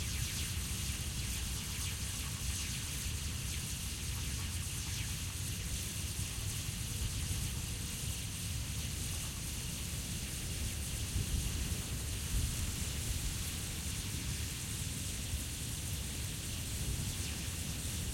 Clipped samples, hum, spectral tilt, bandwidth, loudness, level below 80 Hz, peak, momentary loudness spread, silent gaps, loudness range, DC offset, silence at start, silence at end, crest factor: under 0.1%; none; -3 dB/octave; 16.5 kHz; -38 LUFS; -44 dBFS; -24 dBFS; 2 LU; none; 1 LU; under 0.1%; 0 s; 0 s; 14 dB